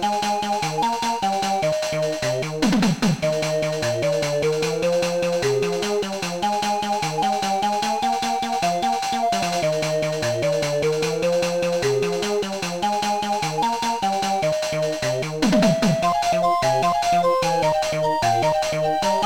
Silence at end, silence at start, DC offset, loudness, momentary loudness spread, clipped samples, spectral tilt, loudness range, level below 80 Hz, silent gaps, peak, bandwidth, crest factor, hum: 0 s; 0 s; 0.4%; -21 LUFS; 4 LU; under 0.1%; -4.5 dB/octave; 3 LU; -50 dBFS; none; -8 dBFS; 18.5 kHz; 14 dB; none